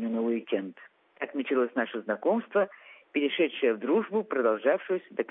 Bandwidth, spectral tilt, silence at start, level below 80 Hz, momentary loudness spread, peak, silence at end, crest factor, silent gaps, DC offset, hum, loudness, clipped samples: 3.9 kHz; -9 dB/octave; 0 s; -88 dBFS; 8 LU; -12 dBFS; 0 s; 18 dB; none; under 0.1%; none; -29 LUFS; under 0.1%